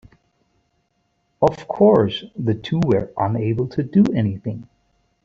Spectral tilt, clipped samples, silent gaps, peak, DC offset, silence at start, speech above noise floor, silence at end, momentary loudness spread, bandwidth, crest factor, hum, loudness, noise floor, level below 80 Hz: -8.5 dB/octave; under 0.1%; none; -2 dBFS; under 0.1%; 1.4 s; 50 dB; 0.6 s; 10 LU; 7.2 kHz; 18 dB; none; -20 LUFS; -68 dBFS; -52 dBFS